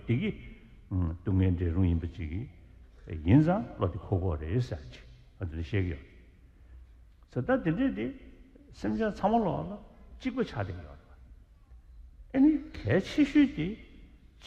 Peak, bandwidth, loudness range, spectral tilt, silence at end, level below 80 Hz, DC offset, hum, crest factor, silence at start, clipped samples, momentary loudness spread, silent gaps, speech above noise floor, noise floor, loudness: -10 dBFS; 8 kHz; 6 LU; -8.5 dB/octave; 0 s; -46 dBFS; under 0.1%; none; 20 dB; 0 s; under 0.1%; 17 LU; none; 27 dB; -55 dBFS; -30 LUFS